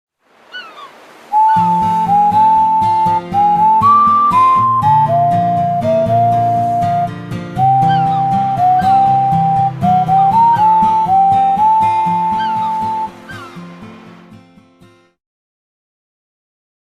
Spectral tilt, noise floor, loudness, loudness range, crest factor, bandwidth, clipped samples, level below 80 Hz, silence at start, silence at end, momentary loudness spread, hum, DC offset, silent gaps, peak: -7.5 dB/octave; -47 dBFS; -12 LUFS; 7 LU; 12 dB; 13 kHz; under 0.1%; -48 dBFS; 0.55 s; 2.65 s; 11 LU; none; under 0.1%; none; -2 dBFS